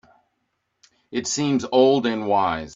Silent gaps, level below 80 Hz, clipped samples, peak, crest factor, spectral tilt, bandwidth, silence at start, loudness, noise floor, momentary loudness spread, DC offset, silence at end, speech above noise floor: none; -58 dBFS; under 0.1%; -4 dBFS; 18 dB; -4.5 dB/octave; 7.8 kHz; 1.1 s; -21 LUFS; -74 dBFS; 10 LU; under 0.1%; 0 s; 54 dB